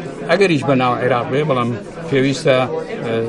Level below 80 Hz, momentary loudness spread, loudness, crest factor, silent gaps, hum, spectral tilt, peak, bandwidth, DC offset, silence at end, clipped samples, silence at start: -50 dBFS; 8 LU; -17 LUFS; 16 dB; none; none; -6 dB/octave; 0 dBFS; 11.5 kHz; under 0.1%; 0 s; under 0.1%; 0 s